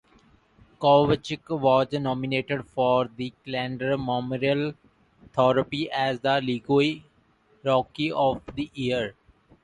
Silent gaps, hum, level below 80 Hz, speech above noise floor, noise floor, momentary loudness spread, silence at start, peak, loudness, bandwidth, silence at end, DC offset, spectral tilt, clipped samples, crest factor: none; none; -56 dBFS; 38 dB; -62 dBFS; 10 LU; 0.8 s; -6 dBFS; -25 LUFS; 10.5 kHz; 0.55 s; under 0.1%; -7 dB/octave; under 0.1%; 20 dB